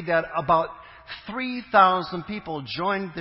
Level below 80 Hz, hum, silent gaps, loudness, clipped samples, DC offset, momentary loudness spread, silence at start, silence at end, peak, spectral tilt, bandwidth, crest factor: -56 dBFS; none; none; -24 LUFS; under 0.1%; under 0.1%; 17 LU; 0 s; 0 s; -4 dBFS; -9.5 dB/octave; 5.8 kHz; 22 dB